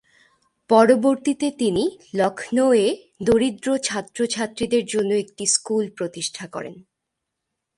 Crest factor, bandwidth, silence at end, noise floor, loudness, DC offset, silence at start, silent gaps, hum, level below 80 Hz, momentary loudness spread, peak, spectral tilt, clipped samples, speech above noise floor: 20 dB; 11.5 kHz; 0.95 s; -81 dBFS; -21 LUFS; under 0.1%; 0.7 s; none; none; -56 dBFS; 11 LU; -2 dBFS; -3.5 dB/octave; under 0.1%; 60 dB